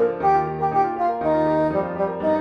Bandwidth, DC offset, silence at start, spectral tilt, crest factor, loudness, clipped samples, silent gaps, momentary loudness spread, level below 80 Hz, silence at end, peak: 6.6 kHz; under 0.1%; 0 s; -9 dB/octave; 12 dB; -21 LUFS; under 0.1%; none; 4 LU; -52 dBFS; 0 s; -8 dBFS